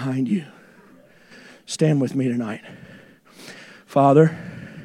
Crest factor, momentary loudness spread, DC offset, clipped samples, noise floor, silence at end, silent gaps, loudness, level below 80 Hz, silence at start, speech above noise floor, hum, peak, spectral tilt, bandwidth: 20 dB; 25 LU; under 0.1%; under 0.1%; -51 dBFS; 0 s; none; -20 LUFS; -66 dBFS; 0 s; 31 dB; none; -2 dBFS; -7 dB/octave; 12 kHz